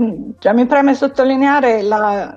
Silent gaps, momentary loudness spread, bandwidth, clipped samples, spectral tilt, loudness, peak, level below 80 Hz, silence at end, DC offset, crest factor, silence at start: none; 4 LU; 7.4 kHz; under 0.1%; -6 dB/octave; -14 LUFS; -2 dBFS; -52 dBFS; 0 s; under 0.1%; 12 dB; 0 s